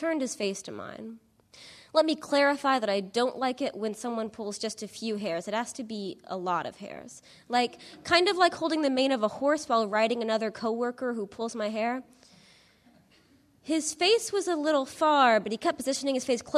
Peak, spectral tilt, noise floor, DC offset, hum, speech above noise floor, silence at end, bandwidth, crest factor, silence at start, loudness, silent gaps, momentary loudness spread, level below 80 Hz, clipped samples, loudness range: -8 dBFS; -3 dB/octave; -62 dBFS; under 0.1%; none; 34 dB; 0 s; 13.5 kHz; 20 dB; 0 s; -28 LUFS; none; 14 LU; -72 dBFS; under 0.1%; 7 LU